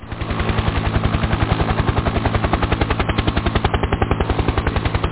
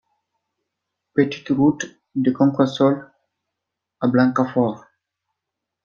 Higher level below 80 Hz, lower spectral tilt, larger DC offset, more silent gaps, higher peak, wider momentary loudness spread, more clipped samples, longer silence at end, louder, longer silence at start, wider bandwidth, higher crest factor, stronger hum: first, -24 dBFS vs -62 dBFS; first, -10.5 dB/octave vs -7 dB/octave; first, 0.6% vs under 0.1%; neither; about the same, -2 dBFS vs -2 dBFS; second, 2 LU vs 10 LU; neither; second, 0 s vs 1.05 s; about the same, -20 LUFS vs -20 LUFS; second, 0 s vs 1.15 s; second, 4 kHz vs 7.2 kHz; about the same, 18 dB vs 20 dB; neither